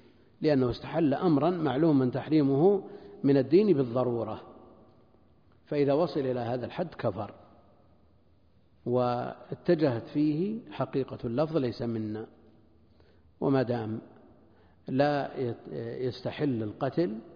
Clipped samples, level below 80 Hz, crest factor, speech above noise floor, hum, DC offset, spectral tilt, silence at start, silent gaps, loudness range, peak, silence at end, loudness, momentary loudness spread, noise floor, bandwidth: under 0.1%; -62 dBFS; 18 dB; 36 dB; none; under 0.1%; -9.5 dB/octave; 0.4 s; none; 8 LU; -12 dBFS; 0 s; -29 LUFS; 12 LU; -64 dBFS; 5.2 kHz